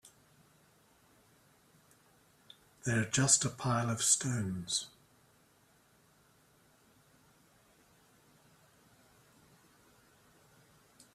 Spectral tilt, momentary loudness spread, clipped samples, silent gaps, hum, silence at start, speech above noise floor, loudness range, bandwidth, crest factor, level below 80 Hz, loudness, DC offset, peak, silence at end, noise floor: -3 dB/octave; 10 LU; under 0.1%; none; none; 2.85 s; 36 dB; 11 LU; 14.5 kHz; 28 dB; -70 dBFS; -31 LUFS; under 0.1%; -12 dBFS; 6.25 s; -68 dBFS